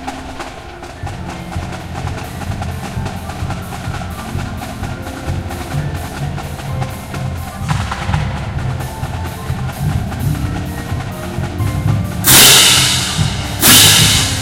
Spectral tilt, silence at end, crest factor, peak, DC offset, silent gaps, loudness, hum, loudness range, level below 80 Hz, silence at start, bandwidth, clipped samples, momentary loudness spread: -2.5 dB/octave; 0 s; 16 dB; 0 dBFS; under 0.1%; none; -13 LUFS; none; 15 LU; -30 dBFS; 0 s; over 20 kHz; 0.3%; 19 LU